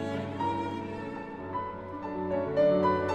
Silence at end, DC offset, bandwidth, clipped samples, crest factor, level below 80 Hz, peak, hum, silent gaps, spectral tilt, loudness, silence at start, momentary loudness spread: 0 s; under 0.1%; 8.8 kHz; under 0.1%; 16 dB; -60 dBFS; -14 dBFS; none; none; -7.5 dB/octave; -31 LUFS; 0 s; 13 LU